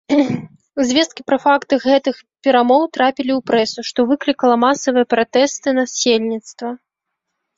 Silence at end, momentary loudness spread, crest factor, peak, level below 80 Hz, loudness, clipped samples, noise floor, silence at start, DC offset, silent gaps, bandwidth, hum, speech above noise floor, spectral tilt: 0.8 s; 11 LU; 14 dB; -2 dBFS; -60 dBFS; -16 LUFS; under 0.1%; -78 dBFS; 0.1 s; under 0.1%; none; 7.8 kHz; none; 62 dB; -3.5 dB/octave